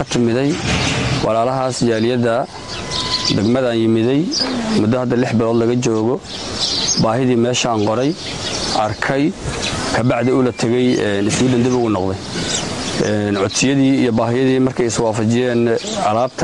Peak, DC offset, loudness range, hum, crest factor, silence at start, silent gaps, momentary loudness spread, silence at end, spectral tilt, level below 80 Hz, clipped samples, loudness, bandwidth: -4 dBFS; 0.3%; 1 LU; none; 12 dB; 0 s; none; 5 LU; 0 s; -4.5 dB/octave; -40 dBFS; under 0.1%; -17 LUFS; 11.5 kHz